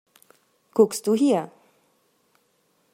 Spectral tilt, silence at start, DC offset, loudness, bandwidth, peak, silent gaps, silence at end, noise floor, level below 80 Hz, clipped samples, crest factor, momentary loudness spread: -5.5 dB/octave; 0.75 s; under 0.1%; -22 LUFS; 16 kHz; -4 dBFS; none; 1.45 s; -67 dBFS; -78 dBFS; under 0.1%; 22 dB; 8 LU